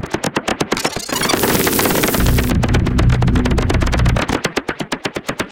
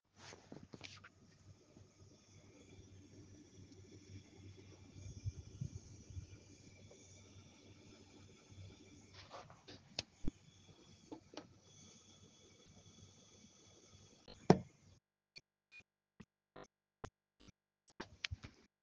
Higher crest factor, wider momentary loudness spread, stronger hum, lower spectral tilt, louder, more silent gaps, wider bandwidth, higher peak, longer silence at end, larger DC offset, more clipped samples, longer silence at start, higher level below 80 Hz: second, 16 dB vs 38 dB; second, 8 LU vs 16 LU; neither; about the same, -4.5 dB/octave vs -5.5 dB/octave; first, -16 LUFS vs -46 LUFS; neither; first, 17.5 kHz vs 9.6 kHz; first, 0 dBFS vs -10 dBFS; second, 0 s vs 0.15 s; neither; neither; second, 0 s vs 0.15 s; first, -22 dBFS vs -64 dBFS